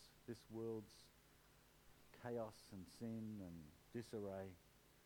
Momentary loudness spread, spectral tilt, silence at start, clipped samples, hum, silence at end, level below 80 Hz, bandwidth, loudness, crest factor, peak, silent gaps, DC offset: 14 LU; -6.5 dB/octave; 0 s; under 0.1%; none; 0 s; -76 dBFS; 19 kHz; -53 LUFS; 18 dB; -36 dBFS; none; under 0.1%